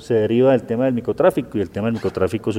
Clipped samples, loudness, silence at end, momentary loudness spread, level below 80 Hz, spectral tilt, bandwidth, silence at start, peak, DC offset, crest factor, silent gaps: under 0.1%; -19 LUFS; 0 s; 7 LU; -52 dBFS; -7.5 dB/octave; 16.5 kHz; 0 s; -4 dBFS; under 0.1%; 14 dB; none